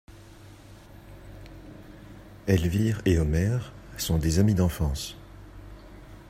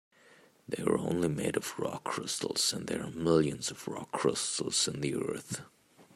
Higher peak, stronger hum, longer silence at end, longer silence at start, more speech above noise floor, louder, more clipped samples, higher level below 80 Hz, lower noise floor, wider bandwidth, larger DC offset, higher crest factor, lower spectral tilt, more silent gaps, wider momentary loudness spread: first, -8 dBFS vs -12 dBFS; neither; about the same, 0.05 s vs 0.15 s; second, 0.1 s vs 0.7 s; second, 24 dB vs 29 dB; first, -26 LUFS vs -32 LUFS; neither; first, -40 dBFS vs -66 dBFS; second, -48 dBFS vs -61 dBFS; about the same, 16 kHz vs 16 kHz; neither; about the same, 20 dB vs 20 dB; first, -6 dB/octave vs -3.5 dB/octave; neither; first, 24 LU vs 9 LU